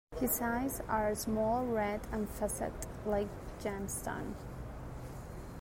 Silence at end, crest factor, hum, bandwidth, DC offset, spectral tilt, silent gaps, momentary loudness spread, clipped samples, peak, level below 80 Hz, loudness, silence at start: 0 s; 16 dB; none; 16 kHz; under 0.1%; -5 dB/octave; none; 13 LU; under 0.1%; -20 dBFS; -48 dBFS; -37 LUFS; 0.1 s